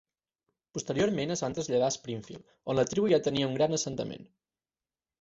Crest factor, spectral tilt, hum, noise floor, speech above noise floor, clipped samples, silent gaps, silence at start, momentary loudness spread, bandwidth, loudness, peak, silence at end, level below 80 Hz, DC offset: 18 dB; -4.5 dB/octave; none; under -90 dBFS; over 60 dB; under 0.1%; none; 0.75 s; 15 LU; 8 kHz; -30 LUFS; -12 dBFS; 0.95 s; -64 dBFS; under 0.1%